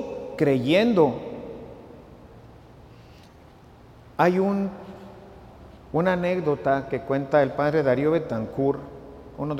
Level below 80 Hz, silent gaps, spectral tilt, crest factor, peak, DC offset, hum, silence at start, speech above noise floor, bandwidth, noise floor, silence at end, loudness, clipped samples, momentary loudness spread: -54 dBFS; none; -7.5 dB/octave; 20 dB; -6 dBFS; under 0.1%; none; 0 s; 27 dB; 15.5 kHz; -49 dBFS; 0 s; -23 LUFS; under 0.1%; 22 LU